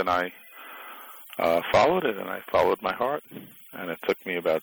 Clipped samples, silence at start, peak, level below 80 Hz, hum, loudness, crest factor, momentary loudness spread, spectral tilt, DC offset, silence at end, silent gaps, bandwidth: under 0.1%; 0 s; -12 dBFS; -58 dBFS; none; -26 LUFS; 16 dB; 21 LU; -5 dB/octave; under 0.1%; 0 s; none; over 20 kHz